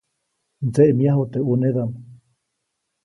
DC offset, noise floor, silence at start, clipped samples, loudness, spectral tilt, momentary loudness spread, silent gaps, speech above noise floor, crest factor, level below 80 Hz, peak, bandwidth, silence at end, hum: under 0.1%; -77 dBFS; 0.6 s; under 0.1%; -20 LUFS; -10 dB/octave; 13 LU; none; 59 dB; 20 dB; -60 dBFS; -2 dBFS; 11.5 kHz; 0.9 s; none